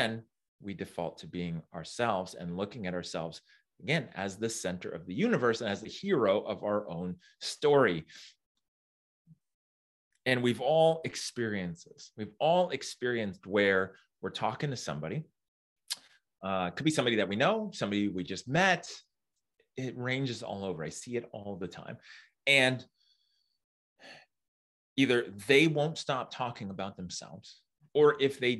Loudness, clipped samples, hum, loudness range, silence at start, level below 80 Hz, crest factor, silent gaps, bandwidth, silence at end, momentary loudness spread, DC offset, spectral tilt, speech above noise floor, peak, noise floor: -31 LUFS; under 0.1%; none; 5 LU; 0 s; -72 dBFS; 22 dB; 0.48-0.59 s, 8.46-8.55 s, 8.68-9.25 s, 9.54-10.11 s, 15.48-15.76 s, 23.64-23.96 s, 24.48-24.96 s; 12.5 kHz; 0 s; 17 LU; under 0.1%; -4.5 dB/octave; 56 dB; -10 dBFS; -87 dBFS